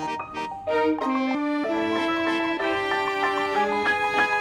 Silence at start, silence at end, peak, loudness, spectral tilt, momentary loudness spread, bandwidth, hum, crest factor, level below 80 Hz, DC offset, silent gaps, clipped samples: 0 s; 0 s; -8 dBFS; -24 LUFS; -4 dB/octave; 5 LU; 14 kHz; none; 16 dB; -58 dBFS; under 0.1%; none; under 0.1%